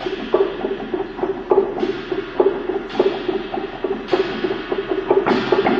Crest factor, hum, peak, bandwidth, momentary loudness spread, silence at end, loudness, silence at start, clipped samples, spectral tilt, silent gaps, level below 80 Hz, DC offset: 18 dB; none; -2 dBFS; 6.8 kHz; 8 LU; 0 s; -21 LUFS; 0 s; under 0.1%; -6.5 dB/octave; none; -46 dBFS; under 0.1%